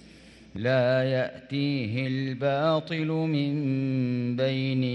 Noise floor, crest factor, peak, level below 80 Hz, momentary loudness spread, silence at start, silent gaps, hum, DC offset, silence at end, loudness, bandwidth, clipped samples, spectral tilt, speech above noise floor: -51 dBFS; 14 dB; -12 dBFS; -64 dBFS; 5 LU; 0.05 s; none; none; under 0.1%; 0 s; -27 LUFS; 7 kHz; under 0.1%; -8.5 dB/octave; 25 dB